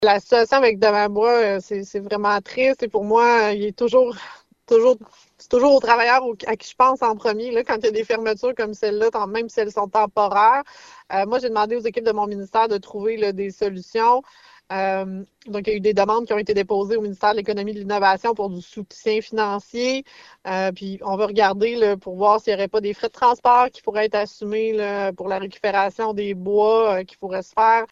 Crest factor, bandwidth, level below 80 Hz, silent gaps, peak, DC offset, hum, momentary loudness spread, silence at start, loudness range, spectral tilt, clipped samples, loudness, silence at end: 18 dB; 7.6 kHz; -58 dBFS; none; -2 dBFS; under 0.1%; none; 10 LU; 0 s; 4 LU; -5 dB/octave; under 0.1%; -20 LUFS; 0.05 s